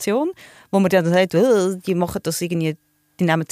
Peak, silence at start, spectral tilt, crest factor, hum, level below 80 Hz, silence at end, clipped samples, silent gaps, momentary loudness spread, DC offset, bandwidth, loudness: -4 dBFS; 0 s; -5.5 dB/octave; 16 dB; none; -54 dBFS; 0.05 s; under 0.1%; none; 8 LU; under 0.1%; 15.5 kHz; -20 LUFS